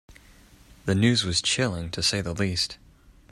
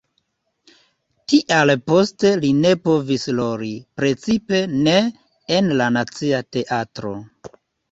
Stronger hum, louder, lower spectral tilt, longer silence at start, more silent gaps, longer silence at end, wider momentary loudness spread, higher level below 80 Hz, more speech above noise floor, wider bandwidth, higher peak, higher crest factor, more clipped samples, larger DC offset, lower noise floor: neither; second, -25 LUFS vs -19 LUFS; second, -4 dB/octave vs -5.5 dB/octave; second, 0.1 s vs 1.3 s; neither; about the same, 0.55 s vs 0.45 s; second, 8 LU vs 12 LU; first, -50 dBFS vs -56 dBFS; second, 28 dB vs 52 dB; first, 15 kHz vs 8 kHz; second, -8 dBFS vs -2 dBFS; about the same, 20 dB vs 18 dB; neither; neither; second, -53 dBFS vs -70 dBFS